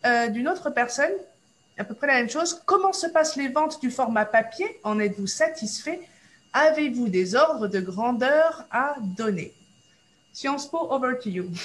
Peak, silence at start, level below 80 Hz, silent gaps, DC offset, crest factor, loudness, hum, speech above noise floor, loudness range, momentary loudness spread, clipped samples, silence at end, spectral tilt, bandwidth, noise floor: -6 dBFS; 0.05 s; -70 dBFS; none; under 0.1%; 18 dB; -24 LUFS; none; 37 dB; 3 LU; 10 LU; under 0.1%; 0 s; -4 dB/octave; 12 kHz; -61 dBFS